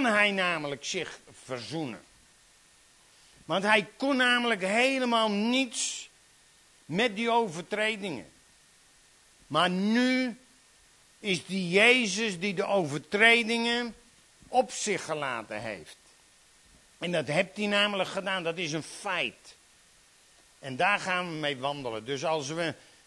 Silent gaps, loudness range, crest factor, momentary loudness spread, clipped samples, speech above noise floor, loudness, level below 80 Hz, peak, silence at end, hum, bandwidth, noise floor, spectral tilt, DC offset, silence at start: none; 7 LU; 22 dB; 14 LU; under 0.1%; 32 dB; -27 LUFS; -70 dBFS; -8 dBFS; 0.3 s; none; 12 kHz; -60 dBFS; -3.5 dB/octave; under 0.1%; 0 s